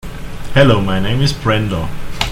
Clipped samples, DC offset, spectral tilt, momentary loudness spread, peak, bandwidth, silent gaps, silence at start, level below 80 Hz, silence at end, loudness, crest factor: under 0.1%; under 0.1%; -6 dB/octave; 15 LU; 0 dBFS; 16 kHz; none; 0.05 s; -28 dBFS; 0 s; -15 LUFS; 14 dB